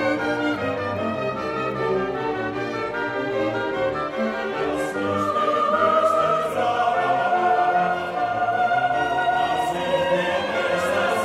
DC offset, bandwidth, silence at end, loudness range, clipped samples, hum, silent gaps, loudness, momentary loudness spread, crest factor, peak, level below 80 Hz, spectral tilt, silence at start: under 0.1%; 15 kHz; 0 s; 5 LU; under 0.1%; none; none; -22 LUFS; 6 LU; 14 dB; -8 dBFS; -54 dBFS; -5 dB/octave; 0 s